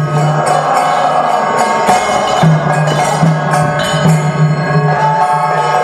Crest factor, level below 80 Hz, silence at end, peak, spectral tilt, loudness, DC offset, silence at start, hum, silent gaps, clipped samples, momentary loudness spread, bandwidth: 10 dB; -44 dBFS; 0 s; 0 dBFS; -5.5 dB/octave; -11 LUFS; under 0.1%; 0 s; none; none; under 0.1%; 2 LU; 14 kHz